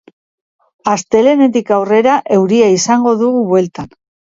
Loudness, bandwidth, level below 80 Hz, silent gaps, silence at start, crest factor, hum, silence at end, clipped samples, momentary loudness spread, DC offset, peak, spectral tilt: -12 LUFS; 7.8 kHz; -54 dBFS; none; 0.85 s; 12 dB; none; 0.45 s; under 0.1%; 10 LU; under 0.1%; 0 dBFS; -5 dB/octave